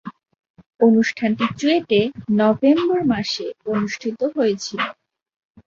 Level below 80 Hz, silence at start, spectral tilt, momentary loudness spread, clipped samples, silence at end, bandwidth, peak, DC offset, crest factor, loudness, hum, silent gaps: -58 dBFS; 0.05 s; -5.5 dB/octave; 9 LU; under 0.1%; 0.75 s; 7.4 kHz; -4 dBFS; under 0.1%; 16 dB; -19 LUFS; none; 0.50-0.54 s, 0.66-0.70 s